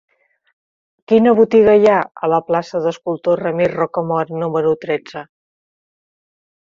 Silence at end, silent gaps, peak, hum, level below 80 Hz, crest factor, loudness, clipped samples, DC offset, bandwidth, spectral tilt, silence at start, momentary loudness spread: 1.45 s; none; -2 dBFS; none; -56 dBFS; 16 dB; -16 LUFS; under 0.1%; under 0.1%; 7.2 kHz; -7.5 dB/octave; 1.1 s; 10 LU